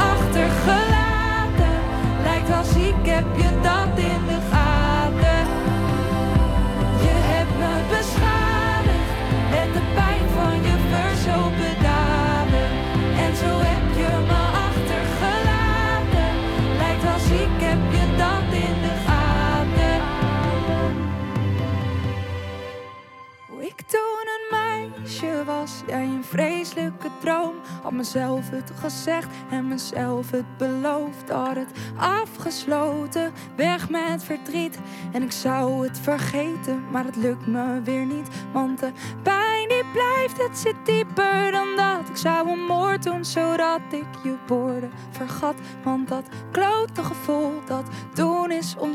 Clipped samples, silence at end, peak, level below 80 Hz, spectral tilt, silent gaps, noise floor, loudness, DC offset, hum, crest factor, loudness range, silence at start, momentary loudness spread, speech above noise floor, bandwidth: under 0.1%; 0 s; -4 dBFS; -28 dBFS; -6 dB/octave; none; -44 dBFS; -22 LUFS; under 0.1%; none; 18 dB; 7 LU; 0 s; 9 LU; 20 dB; 16 kHz